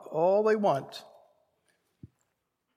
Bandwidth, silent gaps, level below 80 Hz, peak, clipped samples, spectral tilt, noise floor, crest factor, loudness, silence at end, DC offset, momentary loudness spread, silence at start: 14 kHz; none; -78 dBFS; -14 dBFS; under 0.1%; -6.5 dB/octave; -80 dBFS; 18 dB; -26 LUFS; 1.75 s; under 0.1%; 20 LU; 0 s